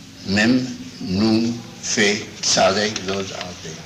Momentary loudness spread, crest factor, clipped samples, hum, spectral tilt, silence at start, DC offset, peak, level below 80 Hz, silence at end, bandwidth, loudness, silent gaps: 13 LU; 16 dB; under 0.1%; none; -3.5 dB/octave; 0 s; under 0.1%; -6 dBFS; -54 dBFS; 0 s; 14.5 kHz; -19 LUFS; none